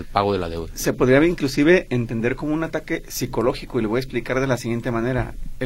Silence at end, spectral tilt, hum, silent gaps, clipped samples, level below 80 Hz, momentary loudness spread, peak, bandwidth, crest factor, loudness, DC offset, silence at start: 0 s; -6 dB/octave; none; none; under 0.1%; -36 dBFS; 10 LU; 0 dBFS; 16.5 kHz; 20 dB; -21 LUFS; under 0.1%; 0 s